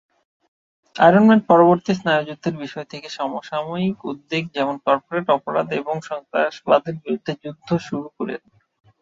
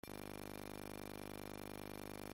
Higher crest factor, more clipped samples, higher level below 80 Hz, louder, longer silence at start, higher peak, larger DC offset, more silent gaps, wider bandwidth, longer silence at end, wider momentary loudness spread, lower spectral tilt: about the same, 18 dB vs 16 dB; neither; about the same, -64 dBFS vs -64 dBFS; first, -20 LUFS vs -50 LUFS; first, 0.95 s vs 0.05 s; first, -2 dBFS vs -34 dBFS; neither; neither; second, 7.6 kHz vs 17 kHz; first, 0.65 s vs 0 s; first, 16 LU vs 0 LU; first, -7 dB/octave vs -4.5 dB/octave